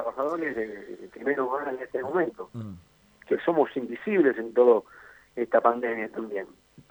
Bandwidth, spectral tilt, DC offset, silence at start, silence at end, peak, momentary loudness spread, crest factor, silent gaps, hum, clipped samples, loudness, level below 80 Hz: over 20 kHz; -8 dB/octave; under 0.1%; 0 s; 0.45 s; -6 dBFS; 17 LU; 22 dB; none; none; under 0.1%; -27 LUFS; -68 dBFS